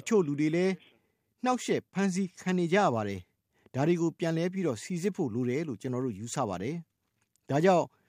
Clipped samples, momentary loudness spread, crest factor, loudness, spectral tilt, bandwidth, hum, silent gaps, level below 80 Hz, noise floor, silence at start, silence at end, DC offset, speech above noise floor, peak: under 0.1%; 9 LU; 20 dB; -30 LUFS; -6 dB/octave; 15.5 kHz; none; none; -74 dBFS; -76 dBFS; 0.05 s; 0.2 s; under 0.1%; 47 dB; -10 dBFS